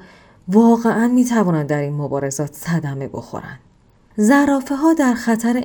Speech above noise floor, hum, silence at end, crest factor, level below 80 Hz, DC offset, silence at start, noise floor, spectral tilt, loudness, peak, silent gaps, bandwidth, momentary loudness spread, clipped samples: 36 dB; none; 0 s; 16 dB; -54 dBFS; under 0.1%; 0.45 s; -52 dBFS; -6.5 dB/octave; -17 LUFS; -2 dBFS; none; 19 kHz; 17 LU; under 0.1%